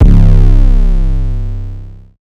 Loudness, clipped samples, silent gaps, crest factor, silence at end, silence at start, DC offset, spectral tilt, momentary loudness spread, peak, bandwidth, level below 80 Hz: -12 LUFS; 10%; none; 8 dB; 0.35 s; 0 s; under 0.1%; -9.5 dB/octave; 17 LU; 0 dBFS; 3 kHz; -8 dBFS